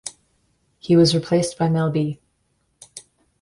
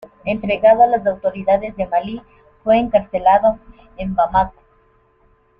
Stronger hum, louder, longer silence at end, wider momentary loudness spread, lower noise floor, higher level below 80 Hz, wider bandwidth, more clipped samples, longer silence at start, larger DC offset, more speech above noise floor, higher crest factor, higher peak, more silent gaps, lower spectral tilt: neither; about the same, -19 LUFS vs -17 LUFS; second, 0.4 s vs 1.1 s; first, 25 LU vs 13 LU; first, -68 dBFS vs -56 dBFS; second, -56 dBFS vs -42 dBFS; first, 11.5 kHz vs 5 kHz; neither; second, 0.05 s vs 0.25 s; neither; first, 50 dB vs 40 dB; about the same, 16 dB vs 16 dB; second, -6 dBFS vs -2 dBFS; neither; second, -6 dB/octave vs -8.5 dB/octave